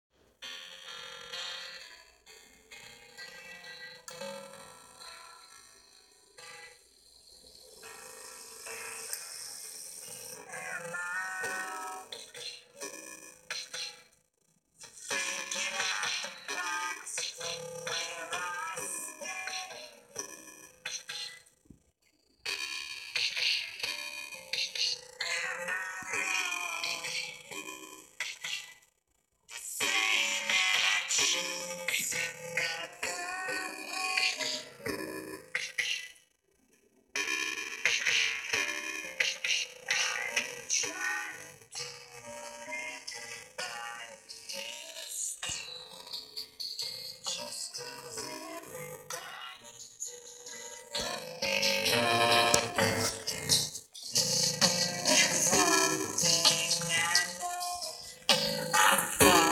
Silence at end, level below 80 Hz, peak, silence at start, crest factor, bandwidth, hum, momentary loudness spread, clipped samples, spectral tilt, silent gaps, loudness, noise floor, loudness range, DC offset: 0 s; -68 dBFS; -2 dBFS; 0.4 s; 32 dB; 17 kHz; none; 20 LU; under 0.1%; -1 dB/octave; none; -31 LUFS; -76 dBFS; 17 LU; under 0.1%